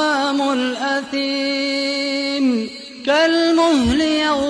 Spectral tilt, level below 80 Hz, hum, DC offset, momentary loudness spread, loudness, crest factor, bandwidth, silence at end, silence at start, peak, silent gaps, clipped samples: -3.5 dB/octave; -42 dBFS; none; under 0.1%; 6 LU; -18 LUFS; 12 dB; 10.5 kHz; 0 s; 0 s; -6 dBFS; none; under 0.1%